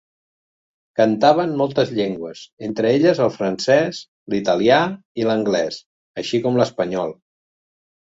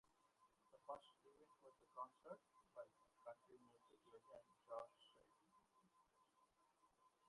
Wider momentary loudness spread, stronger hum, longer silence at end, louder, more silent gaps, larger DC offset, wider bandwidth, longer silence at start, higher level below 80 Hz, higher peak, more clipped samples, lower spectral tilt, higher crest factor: first, 14 LU vs 9 LU; neither; first, 1 s vs 0 s; first, -19 LUFS vs -61 LUFS; first, 2.52-2.57 s, 4.08-4.26 s, 5.05-5.15 s, 5.86-6.14 s vs none; neither; second, 8 kHz vs 11 kHz; first, 0.95 s vs 0.05 s; first, -60 dBFS vs under -90 dBFS; first, -2 dBFS vs -42 dBFS; neither; about the same, -5.5 dB/octave vs -4.5 dB/octave; second, 18 dB vs 24 dB